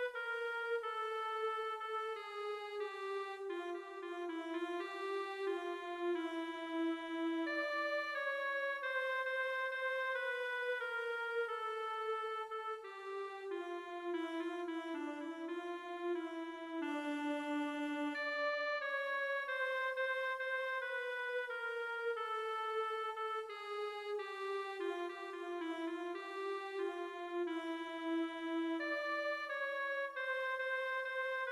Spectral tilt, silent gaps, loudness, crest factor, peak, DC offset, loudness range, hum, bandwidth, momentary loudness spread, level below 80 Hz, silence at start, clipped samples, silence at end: -2 dB/octave; none; -40 LUFS; 14 dB; -28 dBFS; under 0.1%; 5 LU; none; 14 kHz; 6 LU; -86 dBFS; 0 s; under 0.1%; 0 s